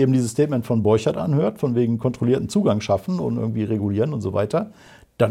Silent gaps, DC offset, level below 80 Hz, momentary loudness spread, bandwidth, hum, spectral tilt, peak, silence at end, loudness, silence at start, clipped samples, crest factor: none; under 0.1%; -54 dBFS; 5 LU; 14.5 kHz; none; -7.5 dB/octave; -6 dBFS; 0 s; -21 LUFS; 0 s; under 0.1%; 16 dB